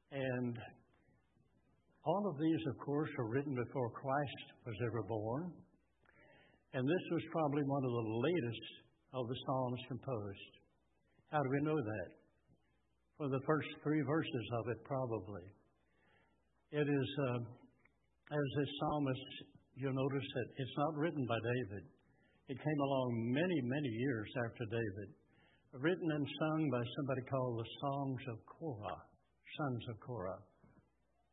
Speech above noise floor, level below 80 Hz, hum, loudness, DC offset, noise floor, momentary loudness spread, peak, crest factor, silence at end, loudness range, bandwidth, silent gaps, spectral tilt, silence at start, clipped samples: 41 dB; -76 dBFS; none; -40 LUFS; under 0.1%; -80 dBFS; 13 LU; -20 dBFS; 22 dB; 0.9 s; 4 LU; 3.9 kHz; none; -5 dB/octave; 0.1 s; under 0.1%